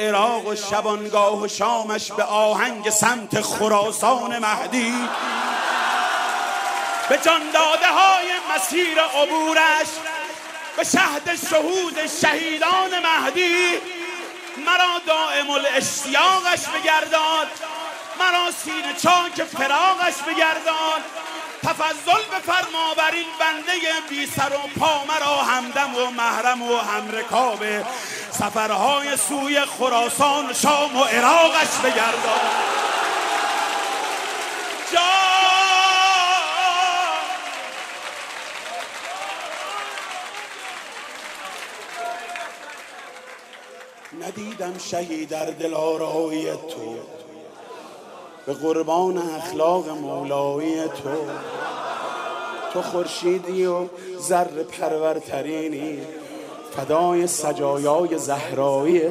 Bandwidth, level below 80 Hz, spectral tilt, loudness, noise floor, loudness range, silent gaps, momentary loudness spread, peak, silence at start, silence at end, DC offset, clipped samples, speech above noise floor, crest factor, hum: 15.5 kHz; -72 dBFS; -2 dB/octave; -20 LUFS; -42 dBFS; 12 LU; none; 15 LU; -2 dBFS; 0 s; 0 s; under 0.1%; under 0.1%; 21 dB; 20 dB; none